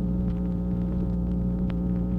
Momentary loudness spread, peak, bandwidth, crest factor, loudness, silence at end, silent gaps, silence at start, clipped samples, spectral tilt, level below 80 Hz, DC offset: 1 LU; -16 dBFS; 3.7 kHz; 10 dB; -28 LUFS; 0 s; none; 0 s; under 0.1%; -11.5 dB/octave; -32 dBFS; under 0.1%